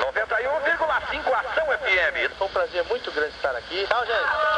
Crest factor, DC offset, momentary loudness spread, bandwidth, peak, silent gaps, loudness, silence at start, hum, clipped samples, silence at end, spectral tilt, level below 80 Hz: 18 dB; under 0.1%; 6 LU; 10.5 kHz; -6 dBFS; none; -24 LUFS; 0 s; none; under 0.1%; 0 s; -3 dB/octave; -50 dBFS